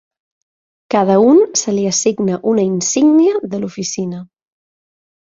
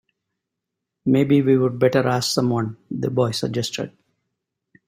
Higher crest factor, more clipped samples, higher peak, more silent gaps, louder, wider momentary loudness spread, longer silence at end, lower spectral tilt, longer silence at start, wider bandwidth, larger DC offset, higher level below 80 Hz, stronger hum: about the same, 14 dB vs 18 dB; neither; about the same, -2 dBFS vs -4 dBFS; neither; first, -14 LUFS vs -20 LUFS; about the same, 12 LU vs 11 LU; about the same, 1.05 s vs 1 s; second, -4.5 dB/octave vs -6 dB/octave; second, 0.9 s vs 1.05 s; second, 7.8 kHz vs 16 kHz; neither; about the same, -60 dBFS vs -60 dBFS; neither